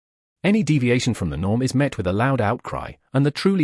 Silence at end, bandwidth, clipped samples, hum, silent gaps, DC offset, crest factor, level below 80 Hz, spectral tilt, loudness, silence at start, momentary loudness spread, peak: 0 s; 12 kHz; under 0.1%; none; none; under 0.1%; 16 dB; -46 dBFS; -6.5 dB/octave; -21 LUFS; 0.45 s; 7 LU; -4 dBFS